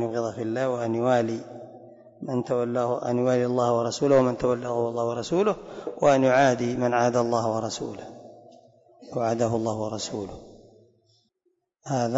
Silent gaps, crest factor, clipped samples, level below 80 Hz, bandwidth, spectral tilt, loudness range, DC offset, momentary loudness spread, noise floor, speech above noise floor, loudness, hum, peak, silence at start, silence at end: none; 16 dB; under 0.1%; -60 dBFS; 8 kHz; -6 dB/octave; 8 LU; under 0.1%; 15 LU; -74 dBFS; 49 dB; -25 LUFS; none; -8 dBFS; 0 s; 0 s